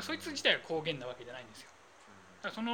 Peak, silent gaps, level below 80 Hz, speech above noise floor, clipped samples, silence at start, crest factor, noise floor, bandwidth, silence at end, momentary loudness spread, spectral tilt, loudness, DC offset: -14 dBFS; none; -76 dBFS; 22 dB; under 0.1%; 0 s; 24 dB; -58 dBFS; 19 kHz; 0 s; 22 LU; -3 dB/octave; -35 LUFS; under 0.1%